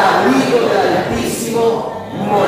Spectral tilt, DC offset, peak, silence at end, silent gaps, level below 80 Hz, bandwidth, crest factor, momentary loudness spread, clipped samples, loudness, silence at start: -4.5 dB/octave; under 0.1%; 0 dBFS; 0 s; none; -44 dBFS; 16 kHz; 14 dB; 9 LU; under 0.1%; -15 LUFS; 0 s